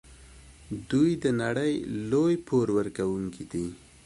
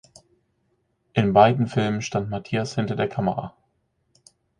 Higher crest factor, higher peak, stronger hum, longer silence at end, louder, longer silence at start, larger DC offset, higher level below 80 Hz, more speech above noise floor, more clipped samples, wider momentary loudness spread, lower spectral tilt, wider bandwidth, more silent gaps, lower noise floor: second, 16 dB vs 22 dB; second, -12 dBFS vs -2 dBFS; neither; second, 0.3 s vs 1.1 s; second, -28 LUFS vs -23 LUFS; second, 0.1 s vs 1.15 s; neither; about the same, -54 dBFS vs -56 dBFS; second, 24 dB vs 49 dB; neither; about the same, 10 LU vs 11 LU; about the same, -7 dB/octave vs -6.5 dB/octave; about the same, 11.5 kHz vs 10.5 kHz; neither; second, -51 dBFS vs -71 dBFS